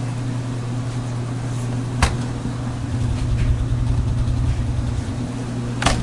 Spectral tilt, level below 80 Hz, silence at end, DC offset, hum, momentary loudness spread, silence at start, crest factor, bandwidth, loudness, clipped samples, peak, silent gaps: -6 dB/octave; -28 dBFS; 0 s; under 0.1%; none; 5 LU; 0 s; 22 dB; 11.5 kHz; -23 LUFS; under 0.1%; 0 dBFS; none